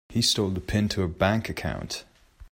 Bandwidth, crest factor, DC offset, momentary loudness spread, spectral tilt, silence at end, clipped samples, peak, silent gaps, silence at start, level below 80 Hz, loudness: 16 kHz; 18 dB; under 0.1%; 11 LU; -4.5 dB/octave; 0.05 s; under 0.1%; -10 dBFS; none; 0.1 s; -46 dBFS; -26 LUFS